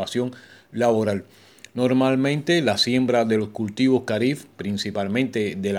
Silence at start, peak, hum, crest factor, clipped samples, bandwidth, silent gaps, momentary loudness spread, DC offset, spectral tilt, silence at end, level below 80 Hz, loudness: 0 s; -6 dBFS; none; 16 dB; under 0.1%; 14.5 kHz; none; 10 LU; under 0.1%; -5.5 dB/octave; 0 s; -64 dBFS; -22 LUFS